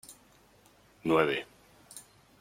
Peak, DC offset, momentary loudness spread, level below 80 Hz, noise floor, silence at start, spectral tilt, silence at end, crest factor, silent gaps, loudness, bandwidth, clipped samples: -10 dBFS; under 0.1%; 23 LU; -68 dBFS; -62 dBFS; 0.1 s; -5 dB/octave; 0.4 s; 24 dB; none; -29 LUFS; 16.5 kHz; under 0.1%